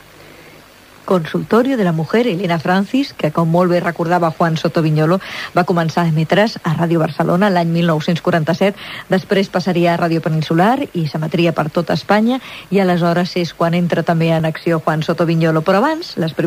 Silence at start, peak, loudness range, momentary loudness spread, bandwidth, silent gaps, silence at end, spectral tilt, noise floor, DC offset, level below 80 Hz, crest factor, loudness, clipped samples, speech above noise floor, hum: 0.4 s; 0 dBFS; 1 LU; 5 LU; 16 kHz; none; 0 s; -7 dB/octave; -42 dBFS; under 0.1%; -54 dBFS; 14 dB; -16 LUFS; under 0.1%; 27 dB; none